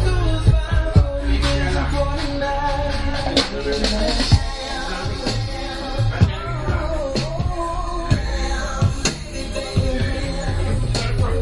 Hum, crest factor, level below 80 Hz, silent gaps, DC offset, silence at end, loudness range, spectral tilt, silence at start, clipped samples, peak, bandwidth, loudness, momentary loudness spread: none; 18 dB; -24 dBFS; none; under 0.1%; 0 s; 3 LU; -5.5 dB/octave; 0 s; under 0.1%; 0 dBFS; 11.5 kHz; -21 LUFS; 7 LU